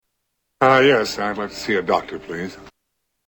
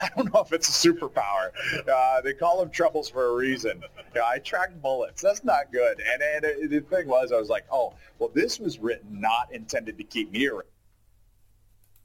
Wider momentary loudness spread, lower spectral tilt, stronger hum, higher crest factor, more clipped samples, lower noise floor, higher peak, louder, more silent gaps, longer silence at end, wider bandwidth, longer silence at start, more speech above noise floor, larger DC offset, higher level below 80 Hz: first, 16 LU vs 9 LU; first, -4.5 dB/octave vs -3 dB/octave; neither; about the same, 20 dB vs 18 dB; neither; first, -75 dBFS vs -60 dBFS; first, -2 dBFS vs -8 dBFS; first, -18 LUFS vs -26 LUFS; neither; second, 0.6 s vs 1.4 s; first, 19 kHz vs 17 kHz; first, 0.6 s vs 0 s; first, 56 dB vs 35 dB; neither; about the same, -54 dBFS vs -58 dBFS